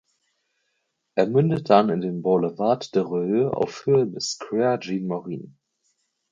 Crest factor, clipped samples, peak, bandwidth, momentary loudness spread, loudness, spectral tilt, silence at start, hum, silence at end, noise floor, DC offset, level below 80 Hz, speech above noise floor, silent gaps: 22 dB; under 0.1%; -2 dBFS; 7.6 kHz; 11 LU; -23 LUFS; -6.5 dB/octave; 1.15 s; none; 0.8 s; -75 dBFS; under 0.1%; -64 dBFS; 53 dB; none